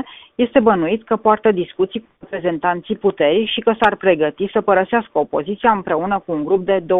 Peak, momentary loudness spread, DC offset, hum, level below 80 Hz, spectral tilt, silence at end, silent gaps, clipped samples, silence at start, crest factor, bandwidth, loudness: 0 dBFS; 7 LU; under 0.1%; none; -52 dBFS; -8 dB/octave; 0 s; none; under 0.1%; 0 s; 18 dB; 4 kHz; -17 LUFS